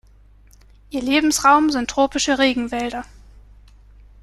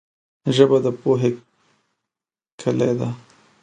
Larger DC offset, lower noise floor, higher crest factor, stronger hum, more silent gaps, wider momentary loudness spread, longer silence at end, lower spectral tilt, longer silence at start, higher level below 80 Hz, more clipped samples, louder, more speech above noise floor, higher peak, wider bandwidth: neither; second, -49 dBFS vs under -90 dBFS; about the same, 18 dB vs 22 dB; first, 50 Hz at -45 dBFS vs none; second, none vs 2.52-2.58 s; about the same, 13 LU vs 13 LU; first, 1.2 s vs 0.45 s; second, -2 dB/octave vs -7 dB/octave; first, 0.9 s vs 0.45 s; first, -46 dBFS vs -64 dBFS; neither; about the same, -18 LUFS vs -20 LUFS; second, 31 dB vs over 72 dB; about the same, -2 dBFS vs 0 dBFS; first, 13.5 kHz vs 9.4 kHz